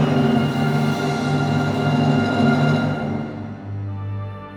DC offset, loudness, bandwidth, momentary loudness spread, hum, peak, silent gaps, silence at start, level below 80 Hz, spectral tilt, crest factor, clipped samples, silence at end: under 0.1%; -20 LUFS; 12 kHz; 12 LU; 50 Hz at -35 dBFS; -6 dBFS; none; 0 s; -50 dBFS; -7.5 dB/octave; 14 dB; under 0.1%; 0 s